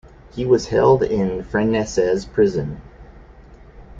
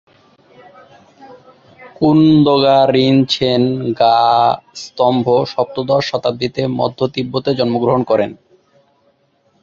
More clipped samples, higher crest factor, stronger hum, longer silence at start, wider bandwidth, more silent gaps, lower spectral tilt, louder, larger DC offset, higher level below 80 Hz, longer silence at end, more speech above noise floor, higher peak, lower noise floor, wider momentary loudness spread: neither; about the same, 18 dB vs 14 dB; neither; second, 0.35 s vs 1.2 s; about the same, 7.8 kHz vs 7.6 kHz; neither; about the same, -6.5 dB/octave vs -7 dB/octave; second, -19 LUFS vs -14 LUFS; neither; first, -42 dBFS vs -52 dBFS; second, 0 s vs 1.3 s; second, 25 dB vs 45 dB; about the same, -2 dBFS vs -2 dBFS; second, -43 dBFS vs -58 dBFS; first, 13 LU vs 9 LU